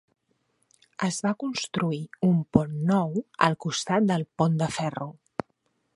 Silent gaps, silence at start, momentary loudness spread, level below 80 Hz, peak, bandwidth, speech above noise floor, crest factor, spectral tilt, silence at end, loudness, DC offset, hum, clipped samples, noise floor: none; 1 s; 12 LU; -58 dBFS; -2 dBFS; 11.5 kHz; 48 dB; 24 dB; -5.5 dB/octave; 0.85 s; -26 LUFS; under 0.1%; none; under 0.1%; -73 dBFS